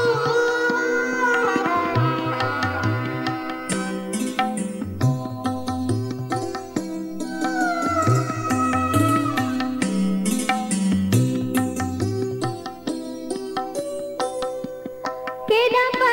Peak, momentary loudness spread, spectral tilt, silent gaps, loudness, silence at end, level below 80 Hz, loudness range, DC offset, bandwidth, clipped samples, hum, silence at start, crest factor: -4 dBFS; 10 LU; -5.5 dB/octave; none; -23 LUFS; 0 s; -54 dBFS; 5 LU; under 0.1%; 16.5 kHz; under 0.1%; none; 0 s; 18 dB